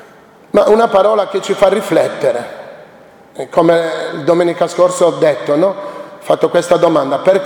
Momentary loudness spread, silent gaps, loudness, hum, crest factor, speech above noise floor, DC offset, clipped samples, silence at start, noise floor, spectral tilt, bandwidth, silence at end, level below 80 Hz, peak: 11 LU; none; -13 LUFS; none; 14 dB; 29 dB; under 0.1%; under 0.1%; 0.55 s; -41 dBFS; -5 dB/octave; 18 kHz; 0 s; -52 dBFS; 0 dBFS